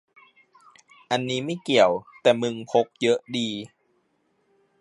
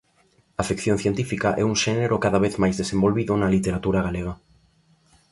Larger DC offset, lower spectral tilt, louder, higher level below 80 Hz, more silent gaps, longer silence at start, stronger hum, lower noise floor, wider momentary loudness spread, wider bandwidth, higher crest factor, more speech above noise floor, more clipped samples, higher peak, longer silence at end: neither; about the same, -4.5 dB/octave vs -5.5 dB/octave; about the same, -24 LUFS vs -23 LUFS; second, -70 dBFS vs -44 dBFS; neither; first, 1.1 s vs 0.6 s; neither; first, -69 dBFS vs -62 dBFS; about the same, 9 LU vs 8 LU; about the same, 11.5 kHz vs 11.5 kHz; about the same, 22 dB vs 18 dB; first, 46 dB vs 40 dB; neither; about the same, -4 dBFS vs -4 dBFS; first, 1.15 s vs 0.95 s